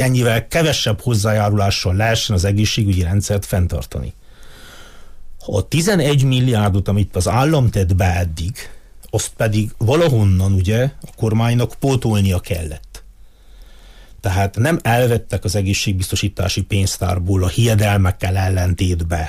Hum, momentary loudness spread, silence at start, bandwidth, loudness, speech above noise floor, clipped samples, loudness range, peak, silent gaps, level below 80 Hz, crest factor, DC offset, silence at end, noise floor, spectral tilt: none; 8 LU; 0 s; 15.5 kHz; -17 LUFS; 25 dB; under 0.1%; 4 LU; -4 dBFS; none; -34 dBFS; 12 dB; under 0.1%; 0 s; -42 dBFS; -5.5 dB/octave